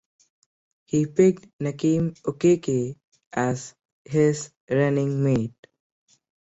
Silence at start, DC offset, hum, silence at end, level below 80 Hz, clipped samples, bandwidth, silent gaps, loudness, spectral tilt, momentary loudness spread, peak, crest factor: 0.95 s; under 0.1%; none; 1.05 s; -60 dBFS; under 0.1%; 8.2 kHz; 1.53-1.59 s, 3.04-3.12 s, 3.26-3.31 s, 3.85-4.05 s, 4.57-4.68 s; -24 LUFS; -7 dB/octave; 12 LU; -6 dBFS; 18 dB